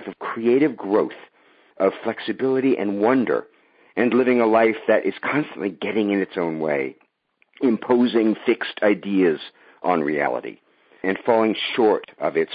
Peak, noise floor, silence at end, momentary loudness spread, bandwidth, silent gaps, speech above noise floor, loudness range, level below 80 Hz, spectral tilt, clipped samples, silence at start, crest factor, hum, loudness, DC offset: -4 dBFS; -65 dBFS; 0 s; 10 LU; 5 kHz; none; 45 dB; 3 LU; -72 dBFS; -10.5 dB/octave; under 0.1%; 0 s; 18 dB; none; -21 LUFS; under 0.1%